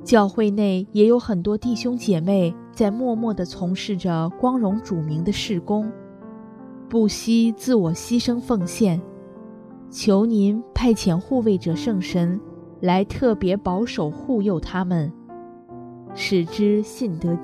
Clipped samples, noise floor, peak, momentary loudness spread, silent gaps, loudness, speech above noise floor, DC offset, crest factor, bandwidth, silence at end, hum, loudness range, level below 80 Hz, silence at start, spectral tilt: under 0.1%; -40 dBFS; -2 dBFS; 21 LU; none; -21 LUFS; 20 dB; under 0.1%; 20 dB; 14 kHz; 0 s; none; 3 LU; -46 dBFS; 0 s; -6.5 dB/octave